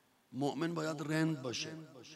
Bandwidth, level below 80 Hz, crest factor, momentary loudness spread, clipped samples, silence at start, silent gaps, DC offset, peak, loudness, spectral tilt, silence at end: 14.5 kHz; -82 dBFS; 16 dB; 11 LU; under 0.1%; 0.3 s; none; under 0.1%; -22 dBFS; -37 LUFS; -5 dB/octave; 0 s